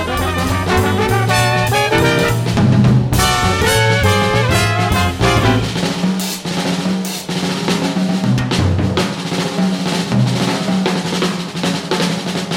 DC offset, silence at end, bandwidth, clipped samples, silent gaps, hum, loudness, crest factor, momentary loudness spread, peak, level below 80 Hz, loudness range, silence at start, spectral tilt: under 0.1%; 0 s; 17 kHz; under 0.1%; none; none; -15 LUFS; 14 dB; 6 LU; 0 dBFS; -32 dBFS; 4 LU; 0 s; -5 dB/octave